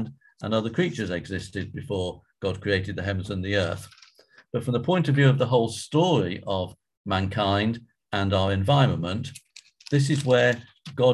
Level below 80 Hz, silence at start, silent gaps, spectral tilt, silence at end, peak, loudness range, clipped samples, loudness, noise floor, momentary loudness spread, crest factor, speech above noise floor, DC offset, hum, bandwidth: -46 dBFS; 0 s; 6.97-7.04 s; -6.5 dB/octave; 0 s; -6 dBFS; 5 LU; under 0.1%; -25 LUFS; -56 dBFS; 13 LU; 20 dB; 32 dB; under 0.1%; none; 12 kHz